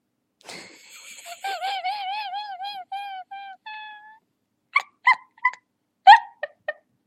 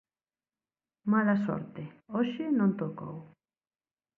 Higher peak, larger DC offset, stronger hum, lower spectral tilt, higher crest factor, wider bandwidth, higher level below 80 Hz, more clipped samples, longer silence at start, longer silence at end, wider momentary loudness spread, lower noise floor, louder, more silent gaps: first, 0 dBFS vs -16 dBFS; neither; neither; second, 1 dB/octave vs -9.5 dB/octave; first, 24 dB vs 16 dB; first, 13.5 kHz vs 4.3 kHz; second, under -90 dBFS vs -74 dBFS; neither; second, 0.5 s vs 1.05 s; second, 0.35 s vs 0.9 s; first, 25 LU vs 17 LU; second, -74 dBFS vs under -90 dBFS; first, -21 LUFS vs -30 LUFS; neither